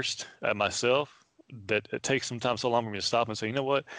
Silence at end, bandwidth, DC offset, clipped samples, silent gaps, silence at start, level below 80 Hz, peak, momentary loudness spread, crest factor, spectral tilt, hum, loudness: 0 s; 10 kHz; under 0.1%; under 0.1%; none; 0 s; -68 dBFS; -14 dBFS; 5 LU; 16 dB; -3.5 dB/octave; none; -29 LUFS